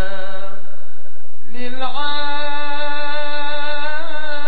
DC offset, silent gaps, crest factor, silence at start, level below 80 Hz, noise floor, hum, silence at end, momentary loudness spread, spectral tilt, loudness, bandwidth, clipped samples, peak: 50%; none; 14 dB; 0 s; -56 dBFS; -50 dBFS; none; 0 s; 13 LU; -6.5 dB/octave; -25 LUFS; 4.8 kHz; under 0.1%; -4 dBFS